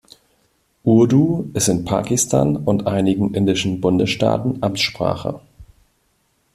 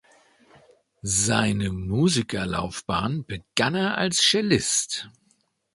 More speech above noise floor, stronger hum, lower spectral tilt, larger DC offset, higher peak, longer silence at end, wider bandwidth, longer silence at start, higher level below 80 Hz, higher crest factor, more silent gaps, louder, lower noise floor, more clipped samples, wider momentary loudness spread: first, 47 dB vs 43 dB; neither; first, -5 dB/octave vs -3.5 dB/octave; neither; about the same, -2 dBFS vs -4 dBFS; first, 0.9 s vs 0.65 s; first, 15 kHz vs 11.5 kHz; second, 0.85 s vs 1.05 s; about the same, -48 dBFS vs -48 dBFS; second, 16 dB vs 22 dB; neither; first, -18 LUFS vs -23 LUFS; about the same, -64 dBFS vs -67 dBFS; neither; second, 7 LU vs 11 LU